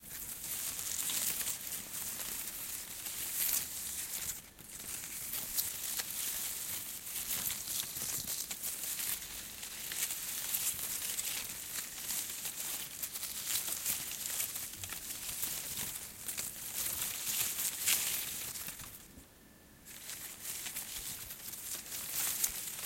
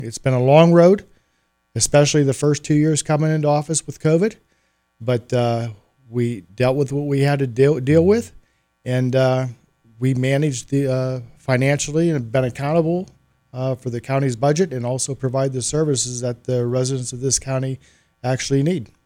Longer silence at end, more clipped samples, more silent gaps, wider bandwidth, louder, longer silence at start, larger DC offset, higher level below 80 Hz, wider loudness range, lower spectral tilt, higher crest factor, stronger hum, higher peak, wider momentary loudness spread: second, 0 s vs 0.2 s; neither; neither; about the same, 17 kHz vs 15.5 kHz; second, -36 LUFS vs -19 LUFS; about the same, 0 s vs 0 s; neither; second, -66 dBFS vs -50 dBFS; about the same, 3 LU vs 4 LU; second, 0.5 dB/octave vs -5.5 dB/octave; first, 26 dB vs 18 dB; neither; second, -14 dBFS vs 0 dBFS; about the same, 9 LU vs 11 LU